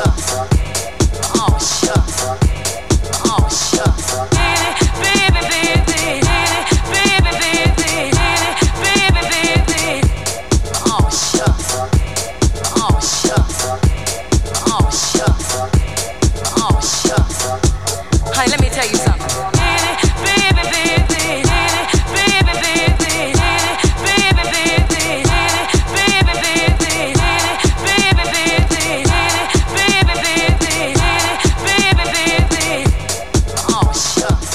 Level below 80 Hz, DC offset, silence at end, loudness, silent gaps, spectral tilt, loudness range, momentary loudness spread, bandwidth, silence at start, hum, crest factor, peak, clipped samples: -20 dBFS; 2%; 0 s; -14 LUFS; none; -3.5 dB/octave; 3 LU; 5 LU; 15.5 kHz; 0 s; none; 14 dB; 0 dBFS; under 0.1%